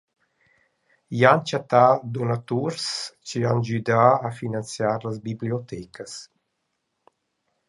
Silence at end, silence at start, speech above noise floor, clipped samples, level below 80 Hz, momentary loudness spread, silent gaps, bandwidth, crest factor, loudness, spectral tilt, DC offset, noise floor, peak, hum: 1.45 s; 1.1 s; 54 dB; under 0.1%; -64 dBFS; 17 LU; none; 11.5 kHz; 22 dB; -23 LUFS; -5.5 dB/octave; under 0.1%; -77 dBFS; -2 dBFS; none